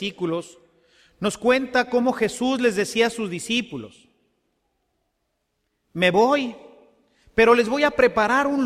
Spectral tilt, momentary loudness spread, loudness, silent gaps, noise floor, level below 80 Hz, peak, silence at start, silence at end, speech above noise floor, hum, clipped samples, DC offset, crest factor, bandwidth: -4 dB/octave; 12 LU; -21 LUFS; none; -75 dBFS; -54 dBFS; -4 dBFS; 0 s; 0 s; 54 dB; none; under 0.1%; under 0.1%; 20 dB; 14.5 kHz